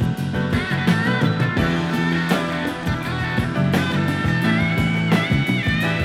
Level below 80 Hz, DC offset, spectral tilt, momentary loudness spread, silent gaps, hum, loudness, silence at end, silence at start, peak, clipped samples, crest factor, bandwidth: -38 dBFS; under 0.1%; -6.5 dB/octave; 5 LU; none; none; -20 LUFS; 0 s; 0 s; -4 dBFS; under 0.1%; 16 dB; 15.5 kHz